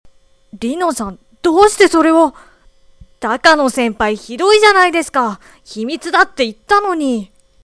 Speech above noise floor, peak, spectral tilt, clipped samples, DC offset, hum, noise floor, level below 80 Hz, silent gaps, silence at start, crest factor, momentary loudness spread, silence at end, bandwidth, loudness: 34 dB; 0 dBFS; -3 dB/octave; under 0.1%; under 0.1%; none; -47 dBFS; -46 dBFS; none; 0.55 s; 14 dB; 14 LU; 0.4 s; 11 kHz; -13 LUFS